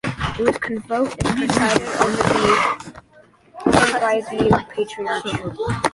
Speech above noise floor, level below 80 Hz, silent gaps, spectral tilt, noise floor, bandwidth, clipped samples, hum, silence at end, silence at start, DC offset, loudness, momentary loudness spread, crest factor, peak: 32 dB; -42 dBFS; none; -4.5 dB/octave; -51 dBFS; 11.5 kHz; under 0.1%; none; 0.05 s; 0.05 s; under 0.1%; -19 LUFS; 9 LU; 18 dB; -2 dBFS